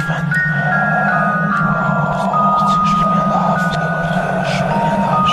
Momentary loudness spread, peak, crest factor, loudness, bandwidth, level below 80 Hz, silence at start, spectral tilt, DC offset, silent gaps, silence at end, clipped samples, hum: 4 LU; -4 dBFS; 12 dB; -15 LUFS; 13 kHz; -40 dBFS; 0 s; -6.5 dB/octave; under 0.1%; none; 0 s; under 0.1%; none